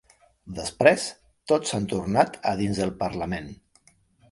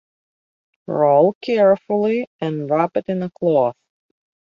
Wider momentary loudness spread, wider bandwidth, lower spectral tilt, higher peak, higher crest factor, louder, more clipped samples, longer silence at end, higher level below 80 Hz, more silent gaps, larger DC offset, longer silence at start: first, 14 LU vs 10 LU; first, 11.5 kHz vs 6.8 kHz; second, -5 dB/octave vs -9 dB/octave; about the same, 0 dBFS vs -2 dBFS; first, 26 dB vs 16 dB; second, -25 LUFS vs -18 LUFS; neither; about the same, 0.75 s vs 0.8 s; first, -50 dBFS vs -66 dBFS; second, none vs 1.35-1.41 s, 2.27-2.39 s; neither; second, 0.45 s vs 0.9 s